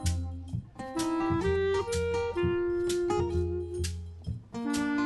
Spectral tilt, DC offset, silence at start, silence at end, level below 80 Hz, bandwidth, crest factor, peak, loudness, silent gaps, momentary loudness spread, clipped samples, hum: -6 dB/octave; under 0.1%; 0 s; 0 s; -40 dBFS; 12.5 kHz; 14 dB; -16 dBFS; -31 LUFS; none; 10 LU; under 0.1%; none